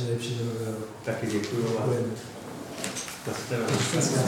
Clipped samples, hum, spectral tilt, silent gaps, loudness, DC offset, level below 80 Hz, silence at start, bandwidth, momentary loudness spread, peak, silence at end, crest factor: under 0.1%; none; -4.5 dB/octave; none; -30 LUFS; under 0.1%; -64 dBFS; 0 s; 19 kHz; 10 LU; -10 dBFS; 0 s; 18 dB